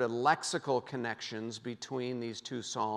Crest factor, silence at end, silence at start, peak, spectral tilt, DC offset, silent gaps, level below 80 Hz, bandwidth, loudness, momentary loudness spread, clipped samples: 20 dB; 0 s; 0 s; -14 dBFS; -4 dB/octave; under 0.1%; none; -84 dBFS; 12.5 kHz; -35 LUFS; 10 LU; under 0.1%